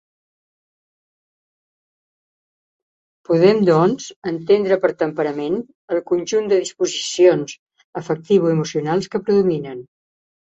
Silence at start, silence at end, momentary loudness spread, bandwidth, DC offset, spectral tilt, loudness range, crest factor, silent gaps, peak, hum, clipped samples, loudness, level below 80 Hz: 3.3 s; 0.6 s; 12 LU; 8.2 kHz; under 0.1%; -5.5 dB/octave; 2 LU; 18 dB; 4.16-4.22 s, 5.75-5.88 s, 7.59-7.66 s, 7.84-7.93 s; -2 dBFS; none; under 0.1%; -18 LUFS; -62 dBFS